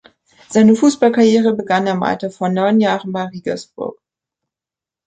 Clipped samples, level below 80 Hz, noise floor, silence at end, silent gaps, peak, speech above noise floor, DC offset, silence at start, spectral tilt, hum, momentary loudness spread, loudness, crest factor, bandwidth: under 0.1%; -60 dBFS; -88 dBFS; 1.15 s; none; -2 dBFS; 74 dB; under 0.1%; 0.5 s; -6 dB/octave; none; 13 LU; -15 LUFS; 16 dB; 9 kHz